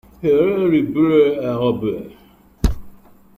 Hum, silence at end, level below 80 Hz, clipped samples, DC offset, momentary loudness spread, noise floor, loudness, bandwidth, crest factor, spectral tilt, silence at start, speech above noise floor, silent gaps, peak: none; 0.45 s; -30 dBFS; under 0.1%; under 0.1%; 13 LU; -42 dBFS; -18 LUFS; 15.5 kHz; 16 dB; -8 dB/octave; 0.2 s; 26 dB; none; -4 dBFS